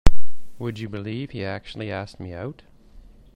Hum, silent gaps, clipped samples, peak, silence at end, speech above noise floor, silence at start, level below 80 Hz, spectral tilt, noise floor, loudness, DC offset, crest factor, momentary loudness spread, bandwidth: none; none; 0.3%; 0 dBFS; 0 s; 19 dB; 0.05 s; -30 dBFS; -6.5 dB/octave; -47 dBFS; -31 LUFS; under 0.1%; 16 dB; 6 LU; 8.2 kHz